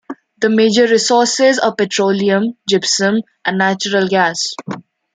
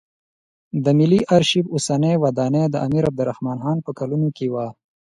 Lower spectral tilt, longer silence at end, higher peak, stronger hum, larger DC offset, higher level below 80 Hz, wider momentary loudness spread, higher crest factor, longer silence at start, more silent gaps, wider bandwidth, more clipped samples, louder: second, -3.5 dB/octave vs -6.5 dB/octave; about the same, 0.35 s vs 0.3 s; about the same, -2 dBFS vs -2 dBFS; neither; neither; second, -64 dBFS vs -54 dBFS; about the same, 9 LU vs 9 LU; about the same, 14 dB vs 18 dB; second, 0.1 s vs 0.75 s; neither; second, 9.6 kHz vs 11.5 kHz; neither; first, -14 LUFS vs -20 LUFS